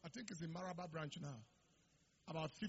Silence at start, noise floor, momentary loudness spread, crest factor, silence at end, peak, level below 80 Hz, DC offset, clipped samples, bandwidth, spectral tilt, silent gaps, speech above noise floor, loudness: 0.05 s; -77 dBFS; 7 LU; 18 dB; 0 s; -32 dBFS; -80 dBFS; under 0.1%; under 0.1%; 7.6 kHz; -5 dB/octave; none; 28 dB; -50 LUFS